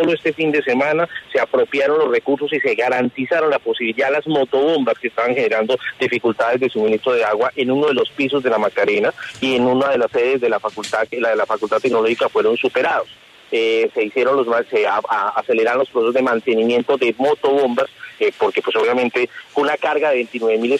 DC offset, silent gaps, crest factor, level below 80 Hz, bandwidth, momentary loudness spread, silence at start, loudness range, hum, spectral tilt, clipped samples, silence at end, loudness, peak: under 0.1%; none; 12 dB; -64 dBFS; 11 kHz; 4 LU; 0 s; 1 LU; none; -5 dB/octave; under 0.1%; 0 s; -18 LUFS; -4 dBFS